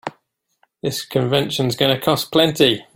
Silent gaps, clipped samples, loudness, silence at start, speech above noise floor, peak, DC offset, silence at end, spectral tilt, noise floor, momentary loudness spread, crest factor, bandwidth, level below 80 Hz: none; under 0.1%; -18 LUFS; 0.05 s; 47 dB; -2 dBFS; under 0.1%; 0.15 s; -4.5 dB/octave; -65 dBFS; 10 LU; 18 dB; 17 kHz; -56 dBFS